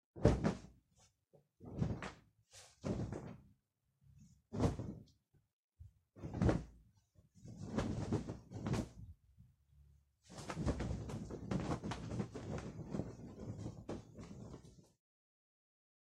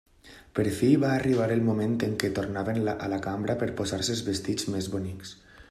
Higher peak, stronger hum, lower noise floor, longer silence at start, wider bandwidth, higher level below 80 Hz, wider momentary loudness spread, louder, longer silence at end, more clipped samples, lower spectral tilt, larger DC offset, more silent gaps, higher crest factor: second, -14 dBFS vs -8 dBFS; neither; first, -82 dBFS vs -48 dBFS; about the same, 0.15 s vs 0.25 s; second, 12 kHz vs 14.5 kHz; about the same, -54 dBFS vs -56 dBFS; first, 22 LU vs 10 LU; second, -43 LUFS vs -28 LUFS; first, 1.2 s vs 0.1 s; neither; first, -7 dB/octave vs -5.5 dB/octave; neither; first, 5.53-5.69 s vs none; first, 30 dB vs 20 dB